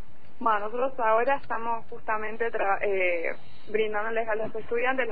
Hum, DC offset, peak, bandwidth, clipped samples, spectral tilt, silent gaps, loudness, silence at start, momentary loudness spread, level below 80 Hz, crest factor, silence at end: none; 4%; -10 dBFS; 4.9 kHz; under 0.1%; -8 dB/octave; none; -28 LUFS; 0.35 s; 8 LU; -58 dBFS; 16 dB; 0 s